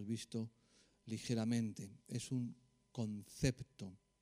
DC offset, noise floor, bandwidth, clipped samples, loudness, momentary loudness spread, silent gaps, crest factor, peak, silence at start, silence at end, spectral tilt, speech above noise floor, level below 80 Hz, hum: under 0.1%; -67 dBFS; 15.5 kHz; under 0.1%; -43 LUFS; 14 LU; none; 24 dB; -20 dBFS; 0 s; 0.25 s; -6 dB/octave; 25 dB; -64 dBFS; none